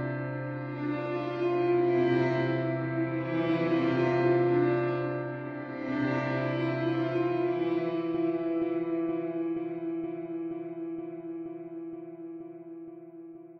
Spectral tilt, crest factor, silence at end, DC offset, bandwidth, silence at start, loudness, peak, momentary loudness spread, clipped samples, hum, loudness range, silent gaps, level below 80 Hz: -9 dB/octave; 14 dB; 0 s; under 0.1%; 5.8 kHz; 0 s; -30 LUFS; -16 dBFS; 16 LU; under 0.1%; none; 10 LU; none; -70 dBFS